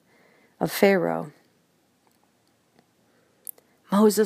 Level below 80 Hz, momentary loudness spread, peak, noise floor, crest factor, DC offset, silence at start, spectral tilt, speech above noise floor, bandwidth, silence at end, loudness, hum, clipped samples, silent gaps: -70 dBFS; 21 LU; -4 dBFS; -66 dBFS; 22 dB; under 0.1%; 0.6 s; -5.5 dB/octave; 45 dB; 15.5 kHz; 0 s; -23 LUFS; none; under 0.1%; none